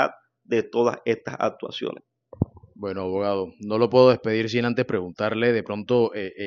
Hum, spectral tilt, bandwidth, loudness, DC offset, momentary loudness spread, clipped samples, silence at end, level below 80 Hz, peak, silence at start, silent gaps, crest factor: none; -5 dB/octave; 7 kHz; -24 LUFS; under 0.1%; 13 LU; under 0.1%; 0 s; -58 dBFS; -2 dBFS; 0 s; none; 22 dB